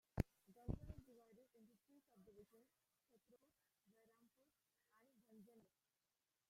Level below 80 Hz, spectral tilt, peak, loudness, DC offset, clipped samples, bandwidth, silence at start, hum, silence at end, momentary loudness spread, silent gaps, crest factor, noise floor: -64 dBFS; -8 dB/octave; -22 dBFS; -53 LUFS; under 0.1%; under 0.1%; 15.5 kHz; 0.15 s; none; 0.9 s; 20 LU; none; 36 dB; under -90 dBFS